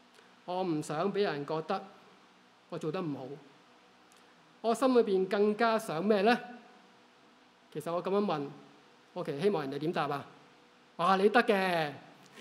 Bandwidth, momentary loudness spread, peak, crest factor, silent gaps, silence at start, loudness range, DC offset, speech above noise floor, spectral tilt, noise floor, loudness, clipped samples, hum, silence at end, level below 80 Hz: 16 kHz; 19 LU; -10 dBFS; 22 dB; none; 0.45 s; 7 LU; under 0.1%; 31 dB; -5.5 dB/octave; -62 dBFS; -31 LUFS; under 0.1%; none; 0 s; -86 dBFS